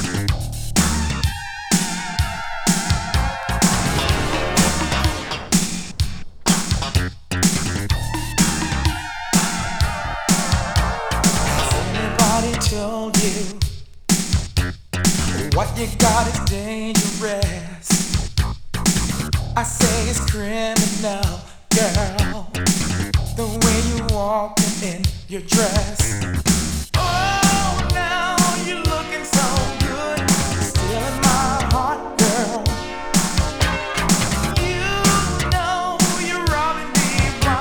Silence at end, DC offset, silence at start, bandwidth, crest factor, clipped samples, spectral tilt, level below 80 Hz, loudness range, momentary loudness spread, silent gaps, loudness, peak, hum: 0 s; under 0.1%; 0 s; over 20 kHz; 18 dB; under 0.1%; -4 dB/octave; -28 dBFS; 2 LU; 7 LU; none; -19 LUFS; -2 dBFS; none